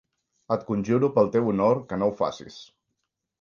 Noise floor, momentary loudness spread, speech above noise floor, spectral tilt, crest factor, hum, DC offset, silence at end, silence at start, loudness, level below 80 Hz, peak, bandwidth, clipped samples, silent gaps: -80 dBFS; 8 LU; 57 dB; -8 dB/octave; 18 dB; none; under 0.1%; 0.8 s; 0.5 s; -24 LUFS; -60 dBFS; -8 dBFS; 7.2 kHz; under 0.1%; none